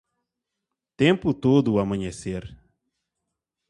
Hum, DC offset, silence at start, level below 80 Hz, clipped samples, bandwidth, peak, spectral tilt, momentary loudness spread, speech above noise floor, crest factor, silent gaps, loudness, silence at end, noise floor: none; under 0.1%; 1 s; -50 dBFS; under 0.1%; 11 kHz; -4 dBFS; -7 dB/octave; 13 LU; 62 dB; 22 dB; none; -23 LUFS; 1.15 s; -84 dBFS